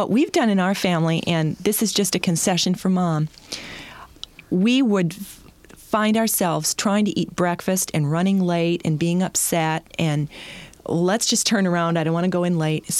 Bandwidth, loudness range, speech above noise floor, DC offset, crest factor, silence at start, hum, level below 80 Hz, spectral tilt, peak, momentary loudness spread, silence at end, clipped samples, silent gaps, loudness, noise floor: 15.5 kHz; 2 LU; 26 dB; under 0.1%; 14 dB; 0 s; none; -56 dBFS; -4.5 dB/octave; -6 dBFS; 14 LU; 0 s; under 0.1%; none; -21 LUFS; -46 dBFS